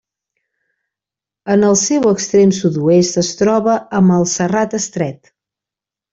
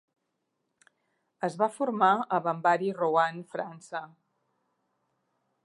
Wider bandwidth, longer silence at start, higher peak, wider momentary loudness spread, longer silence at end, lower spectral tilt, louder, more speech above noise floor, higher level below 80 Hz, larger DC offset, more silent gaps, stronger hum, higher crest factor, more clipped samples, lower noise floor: second, 8 kHz vs 11.5 kHz; about the same, 1.45 s vs 1.4 s; first, -2 dBFS vs -10 dBFS; second, 7 LU vs 14 LU; second, 0.95 s vs 1.6 s; about the same, -5 dB/octave vs -6 dB/octave; first, -14 LUFS vs -28 LUFS; first, 74 dB vs 52 dB; first, -54 dBFS vs -88 dBFS; neither; neither; neither; second, 14 dB vs 22 dB; neither; first, -87 dBFS vs -80 dBFS